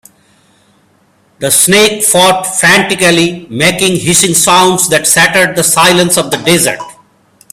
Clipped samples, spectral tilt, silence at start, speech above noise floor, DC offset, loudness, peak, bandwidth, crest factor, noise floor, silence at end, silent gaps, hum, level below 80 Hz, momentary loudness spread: 0.5%; -2.5 dB/octave; 1.4 s; 42 dB; under 0.1%; -7 LUFS; 0 dBFS; over 20 kHz; 10 dB; -50 dBFS; 0.6 s; none; none; -46 dBFS; 5 LU